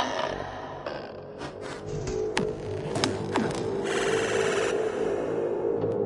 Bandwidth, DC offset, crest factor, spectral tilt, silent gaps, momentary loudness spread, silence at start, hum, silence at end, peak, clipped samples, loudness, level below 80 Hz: 11.5 kHz; under 0.1%; 20 dB; -4.5 dB/octave; none; 11 LU; 0 s; none; 0 s; -8 dBFS; under 0.1%; -29 LUFS; -52 dBFS